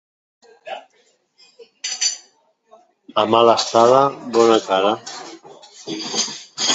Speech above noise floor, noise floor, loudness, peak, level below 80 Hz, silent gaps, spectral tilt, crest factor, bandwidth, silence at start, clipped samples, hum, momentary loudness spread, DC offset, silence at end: 45 dB; -60 dBFS; -17 LUFS; 0 dBFS; -68 dBFS; none; -2.5 dB/octave; 20 dB; 8.2 kHz; 0.65 s; under 0.1%; none; 21 LU; under 0.1%; 0 s